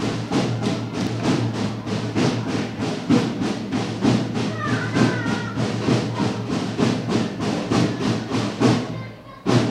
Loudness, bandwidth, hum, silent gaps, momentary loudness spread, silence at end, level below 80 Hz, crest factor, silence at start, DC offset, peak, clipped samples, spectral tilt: -22 LUFS; 12 kHz; none; none; 6 LU; 0 s; -50 dBFS; 18 dB; 0 s; under 0.1%; -4 dBFS; under 0.1%; -6 dB/octave